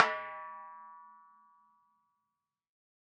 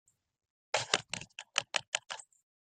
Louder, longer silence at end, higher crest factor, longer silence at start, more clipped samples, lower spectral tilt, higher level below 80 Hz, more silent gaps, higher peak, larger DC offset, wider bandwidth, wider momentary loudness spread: about the same, -37 LUFS vs -35 LUFS; first, 1.95 s vs 0.55 s; about the same, 32 dB vs 32 dB; second, 0 s vs 0.75 s; neither; second, 2 dB/octave vs 0 dB/octave; second, under -90 dBFS vs -76 dBFS; second, none vs 1.88-1.92 s; about the same, -6 dBFS vs -8 dBFS; neither; second, 6.8 kHz vs 13.5 kHz; first, 22 LU vs 11 LU